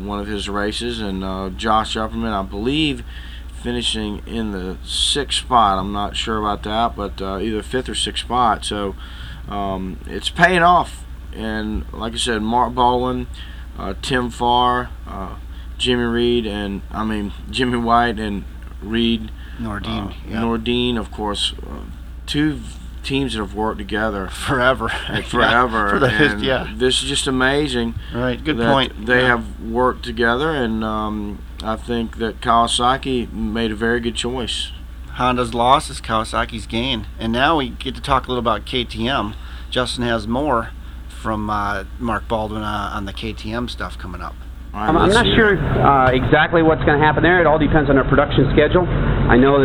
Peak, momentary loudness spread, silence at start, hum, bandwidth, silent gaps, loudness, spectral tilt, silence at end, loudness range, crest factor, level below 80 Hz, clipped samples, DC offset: 0 dBFS; 15 LU; 0 s; none; 18.5 kHz; none; -19 LUFS; -5 dB/octave; 0 s; 7 LU; 18 dB; -30 dBFS; under 0.1%; under 0.1%